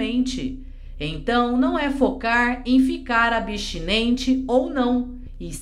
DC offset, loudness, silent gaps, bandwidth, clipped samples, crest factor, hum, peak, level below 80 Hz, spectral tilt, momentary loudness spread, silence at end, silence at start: under 0.1%; -21 LUFS; none; 11.5 kHz; under 0.1%; 16 dB; none; -4 dBFS; -36 dBFS; -4.5 dB/octave; 12 LU; 0 s; 0 s